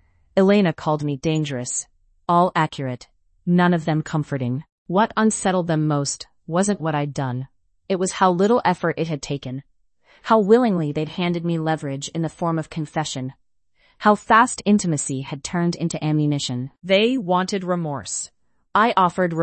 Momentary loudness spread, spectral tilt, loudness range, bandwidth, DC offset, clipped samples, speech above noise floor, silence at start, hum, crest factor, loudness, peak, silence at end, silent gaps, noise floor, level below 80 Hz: 12 LU; -5.5 dB/octave; 2 LU; 8.8 kHz; under 0.1%; under 0.1%; 42 dB; 0.35 s; none; 18 dB; -21 LUFS; -2 dBFS; 0 s; 4.72-4.85 s; -62 dBFS; -58 dBFS